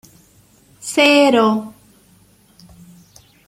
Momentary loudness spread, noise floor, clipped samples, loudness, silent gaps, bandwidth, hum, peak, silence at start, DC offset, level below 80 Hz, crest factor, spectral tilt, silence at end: 20 LU; -52 dBFS; under 0.1%; -14 LUFS; none; 16 kHz; none; -2 dBFS; 0.85 s; under 0.1%; -60 dBFS; 18 dB; -3.5 dB/octave; 1.8 s